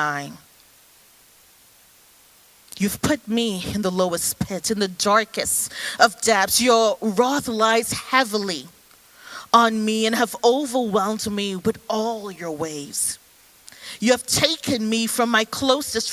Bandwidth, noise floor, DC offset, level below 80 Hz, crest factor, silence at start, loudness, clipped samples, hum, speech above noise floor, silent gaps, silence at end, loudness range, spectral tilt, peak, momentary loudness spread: 16 kHz; -53 dBFS; under 0.1%; -52 dBFS; 22 dB; 0 s; -21 LUFS; under 0.1%; none; 32 dB; none; 0 s; 7 LU; -3 dB/octave; 0 dBFS; 11 LU